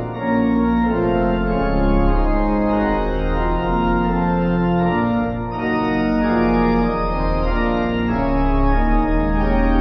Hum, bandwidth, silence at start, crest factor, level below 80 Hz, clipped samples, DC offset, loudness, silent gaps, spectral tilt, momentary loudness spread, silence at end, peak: none; 6 kHz; 0 s; 12 dB; -22 dBFS; under 0.1%; under 0.1%; -19 LUFS; none; -9.5 dB/octave; 4 LU; 0 s; -6 dBFS